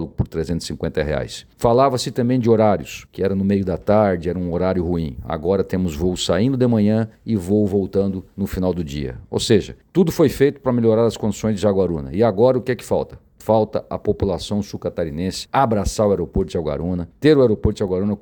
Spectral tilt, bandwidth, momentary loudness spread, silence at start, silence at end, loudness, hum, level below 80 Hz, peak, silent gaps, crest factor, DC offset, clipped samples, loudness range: -6.5 dB/octave; 19 kHz; 9 LU; 0 s; 0.05 s; -20 LUFS; none; -38 dBFS; -2 dBFS; none; 16 dB; under 0.1%; under 0.1%; 3 LU